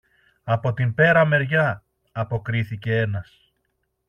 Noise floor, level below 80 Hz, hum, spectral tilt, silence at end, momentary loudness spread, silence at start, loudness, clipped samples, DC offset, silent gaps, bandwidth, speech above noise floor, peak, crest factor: -73 dBFS; -56 dBFS; none; -8.5 dB/octave; 0.85 s; 16 LU; 0.45 s; -21 LUFS; under 0.1%; under 0.1%; none; 6.4 kHz; 52 dB; -4 dBFS; 18 dB